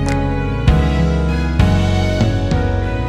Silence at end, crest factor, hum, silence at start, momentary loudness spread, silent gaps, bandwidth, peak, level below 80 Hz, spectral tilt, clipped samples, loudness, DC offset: 0 s; 14 dB; none; 0 s; 4 LU; none; 10.5 kHz; 0 dBFS; -20 dBFS; -7 dB/octave; under 0.1%; -16 LUFS; under 0.1%